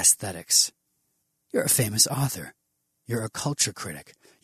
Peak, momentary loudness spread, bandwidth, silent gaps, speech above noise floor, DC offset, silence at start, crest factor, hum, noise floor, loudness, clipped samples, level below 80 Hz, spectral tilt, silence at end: -4 dBFS; 17 LU; 13.5 kHz; none; 50 dB; under 0.1%; 0 s; 24 dB; none; -76 dBFS; -23 LUFS; under 0.1%; -62 dBFS; -2.5 dB/octave; 0.4 s